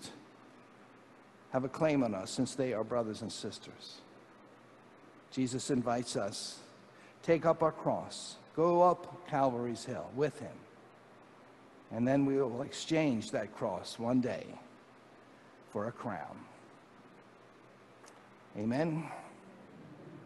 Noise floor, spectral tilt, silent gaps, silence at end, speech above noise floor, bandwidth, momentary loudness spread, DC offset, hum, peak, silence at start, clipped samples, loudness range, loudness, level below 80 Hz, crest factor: -59 dBFS; -5.5 dB/octave; none; 0 s; 25 dB; 12.5 kHz; 22 LU; under 0.1%; none; -14 dBFS; 0 s; under 0.1%; 9 LU; -34 LUFS; -72 dBFS; 22 dB